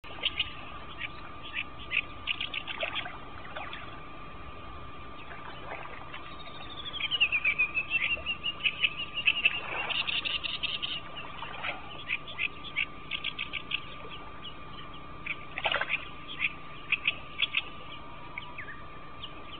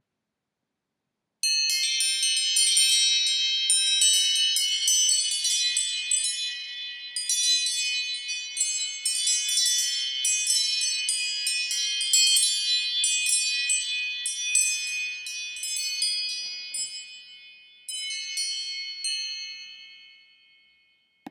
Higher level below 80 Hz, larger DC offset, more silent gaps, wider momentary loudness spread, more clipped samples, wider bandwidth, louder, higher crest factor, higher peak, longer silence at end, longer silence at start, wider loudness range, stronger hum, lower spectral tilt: first, -54 dBFS vs under -90 dBFS; first, 0.6% vs under 0.1%; neither; first, 17 LU vs 13 LU; neither; second, 4.7 kHz vs 19 kHz; second, -31 LUFS vs -23 LUFS; about the same, 24 dB vs 20 dB; second, -10 dBFS vs -6 dBFS; about the same, 0 s vs 0 s; second, 0.05 s vs 1.45 s; about the same, 11 LU vs 11 LU; neither; first, -6 dB/octave vs 6.5 dB/octave